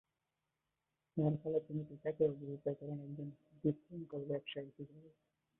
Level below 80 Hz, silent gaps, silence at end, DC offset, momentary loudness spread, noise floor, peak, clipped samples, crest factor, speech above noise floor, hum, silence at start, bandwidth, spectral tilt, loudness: -76 dBFS; none; 0.5 s; under 0.1%; 12 LU; -89 dBFS; -22 dBFS; under 0.1%; 20 dB; 48 dB; none; 1.15 s; 3.8 kHz; -8.5 dB/octave; -41 LUFS